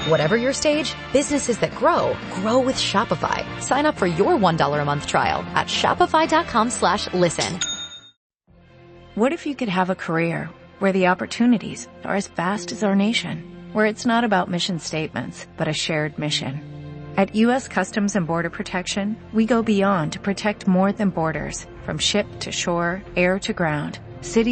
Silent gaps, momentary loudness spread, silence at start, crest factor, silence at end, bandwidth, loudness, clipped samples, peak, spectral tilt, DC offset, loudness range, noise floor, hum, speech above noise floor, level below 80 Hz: 8.17-8.30 s; 9 LU; 0 s; 18 dB; 0 s; 8.8 kHz; -21 LUFS; under 0.1%; -4 dBFS; -4.5 dB/octave; under 0.1%; 4 LU; -51 dBFS; none; 30 dB; -50 dBFS